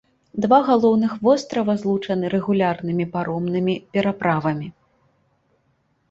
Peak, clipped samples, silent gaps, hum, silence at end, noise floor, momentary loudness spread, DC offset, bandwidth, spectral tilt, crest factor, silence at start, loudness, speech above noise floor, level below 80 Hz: -2 dBFS; under 0.1%; none; none; 1.4 s; -66 dBFS; 8 LU; under 0.1%; 7.8 kHz; -7.5 dB/octave; 18 dB; 0.35 s; -20 LUFS; 46 dB; -60 dBFS